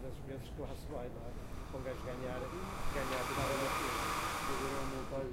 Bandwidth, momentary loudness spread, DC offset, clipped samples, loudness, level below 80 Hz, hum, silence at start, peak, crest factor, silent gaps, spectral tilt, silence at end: 16 kHz; 11 LU; under 0.1%; under 0.1%; -40 LUFS; -48 dBFS; none; 0 s; -24 dBFS; 16 dB; none; -4.5 dB/octave; 0 s